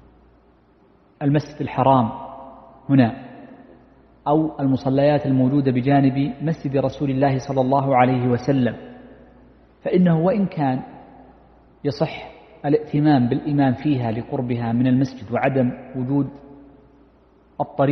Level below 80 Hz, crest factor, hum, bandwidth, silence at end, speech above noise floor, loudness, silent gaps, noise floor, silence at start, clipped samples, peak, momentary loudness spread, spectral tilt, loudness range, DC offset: -52 dBFS; 20 dB; none; 6.4 kHz; 0 s; 36 dB; -20 LUFS; none; -55 dBFS; 1.2 s; under 0.1%; -2 dBFS; 13 LU; -9 dB/octave; 4 LU; under 0.1%